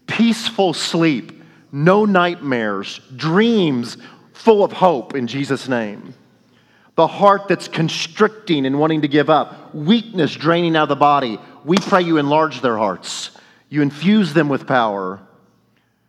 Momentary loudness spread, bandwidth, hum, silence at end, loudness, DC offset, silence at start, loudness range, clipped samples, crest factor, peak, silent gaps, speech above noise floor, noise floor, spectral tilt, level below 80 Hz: 12 LU; 12.5 kHz; none; 0.9 s; -17 LUFS; under 0.1%; 0.1 s; 3 LU; under 0.1%; 18 dB; 0 dBFS; none; 44 dB; -60 dBFS; -5.5 dB/octave; -70 dBFS